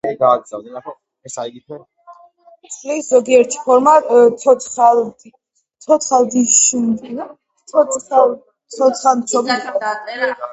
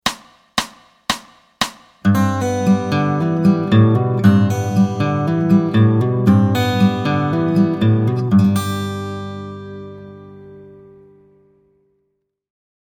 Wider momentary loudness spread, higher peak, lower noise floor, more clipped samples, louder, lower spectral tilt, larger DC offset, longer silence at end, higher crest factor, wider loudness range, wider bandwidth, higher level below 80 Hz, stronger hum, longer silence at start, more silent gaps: first, 21 LU vs 16 LU; about the same, 0 dBFS vs 0 dBFS; second, -47 dBFS vs -70 dBFS; neither; about the same, -14 LUFS vs -16 LUFS; second, -2.5 dB/octave vs -7 dB/octave; neither; second, 0 s vs 2.25 s; about the same, 16 dB vs 18 dB; second, 5 LU vs 9 LU; second, 8.2 kHz vs 16 kHz; second, -64 dBFS vs -54 dBFS; neither; about the same, 0.05 s vs 0.05 s; neither